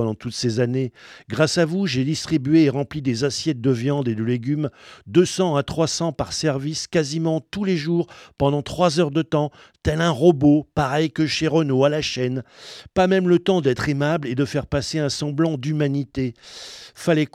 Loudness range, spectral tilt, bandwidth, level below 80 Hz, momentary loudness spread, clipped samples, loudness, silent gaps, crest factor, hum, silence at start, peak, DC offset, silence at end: 3 LU; -6 dB/octave; 13.5 kHz; -48 dBFS; 9 LU; under 0.1%; -21 LUFS; none; 18 dB; none; 0 s; -2 dBFS; under 0.1%; 0.1 s